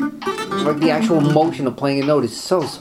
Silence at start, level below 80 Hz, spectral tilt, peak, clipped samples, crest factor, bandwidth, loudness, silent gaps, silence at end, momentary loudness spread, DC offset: 0 s; -58 dBFS; -6 dB/octave; -2 dBFS; under 0.1%; 16 dB; 15.5 kHz; -18 LUFS; none; 0 s; 7 LU; under 0.1%